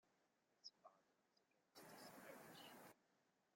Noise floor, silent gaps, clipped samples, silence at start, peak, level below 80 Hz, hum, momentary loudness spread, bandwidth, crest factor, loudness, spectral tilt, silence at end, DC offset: -85 dBFS; none; under 0.1%; 0.05 s; -46 dBFS; under -90 dBFS; none; 5 LU; 16.5 kHz; 22 dB; -63 LUFS; -3 dB/octave; 0 s; under 0.1%